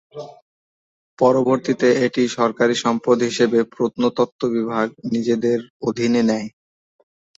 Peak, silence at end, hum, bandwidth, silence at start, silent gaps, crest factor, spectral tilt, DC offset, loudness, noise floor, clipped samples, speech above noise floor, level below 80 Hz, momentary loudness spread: -2 dBFS; 0.9 s; none; 8 kHz; 0.15 s; 0.42-1.17 s, 4.32-4.39 s, 5.70-5.80 s; 18 dB; -5.5 dB/octave; under 0.1%; -19 LUFS; under -90 dBFS; under 0.1%; over 72 dB; -62 dBFS; 7 LU